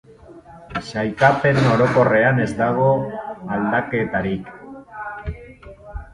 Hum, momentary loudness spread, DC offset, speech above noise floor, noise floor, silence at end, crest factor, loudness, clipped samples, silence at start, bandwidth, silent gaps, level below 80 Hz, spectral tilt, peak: none; 22 LU; under 0.1%; 25 dB; -43 dBFS; 0.1 s; 20 dB; -19 LUFS; under 0.1%; 0.3 s; 11 kHz; none; -42 dBFS; -7.5 dB/octave; 0 dBFS